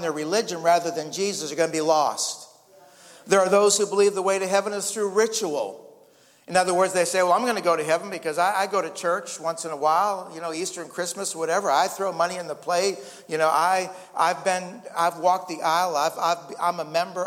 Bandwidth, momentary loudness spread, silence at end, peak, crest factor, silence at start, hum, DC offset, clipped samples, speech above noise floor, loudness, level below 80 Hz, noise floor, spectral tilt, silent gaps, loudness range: 16.5 kHz; 9 LU; 0 s; -4 dBFS; 20 dB; 0 s; none; under 0.1%; under 0.1%; 32 dB; -24 LUFS; -76 dBFS; -56 dBFS; -2.5 dB/octave; none; 3 LU